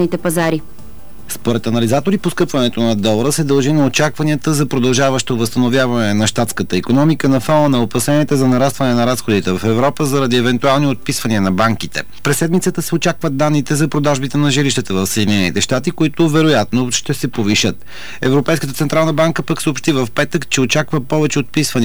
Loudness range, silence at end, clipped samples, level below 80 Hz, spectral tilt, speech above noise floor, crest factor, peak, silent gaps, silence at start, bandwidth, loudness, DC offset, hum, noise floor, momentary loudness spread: 2 LU; 0 s; under 0.1%; -44 dBFS; -5 dB/octave; 22 dB; 10 dB; -4 dBFS; none; 0 s; over 20 kHz; -15 LUFS; 5%; none; -37 dBFS; 5 LU